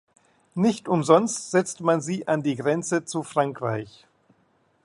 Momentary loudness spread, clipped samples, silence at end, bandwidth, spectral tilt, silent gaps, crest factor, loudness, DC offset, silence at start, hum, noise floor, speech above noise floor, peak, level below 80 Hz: 10 LU; under 0.1%; 0.95 s; 11.5 kHz; -5.5 dB/octave; none; 22 dB; -24 LUFS; under 0.1%; 0.55 s; none; -65 dBFS; 42 dB; -2 dBFS; -68 dBFS